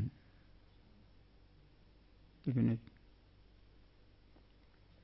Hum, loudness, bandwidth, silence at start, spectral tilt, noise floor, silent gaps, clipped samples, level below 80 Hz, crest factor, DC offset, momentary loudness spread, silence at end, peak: none; -38 LUFS; 5.6 kHz; 0 s; -10 dB/octave; -64 dBFS; none; under 0.1%; -64 dBFS; 22 dB; under 0.1%; 28 LU; 2.25 s; -22 dBFS